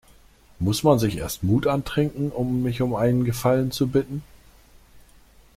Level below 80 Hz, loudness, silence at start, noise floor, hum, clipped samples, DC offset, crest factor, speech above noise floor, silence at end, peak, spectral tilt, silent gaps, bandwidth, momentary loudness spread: -46 dBFS; -23 LUFS; 0.6 s; -53 dBFS; none; under 0.1%; under 0.1%; 18 dB; 31 dB; 0.55 s; -6 dBFS; -6.5 dB/octave; none; 16.5 kHz; 7 LU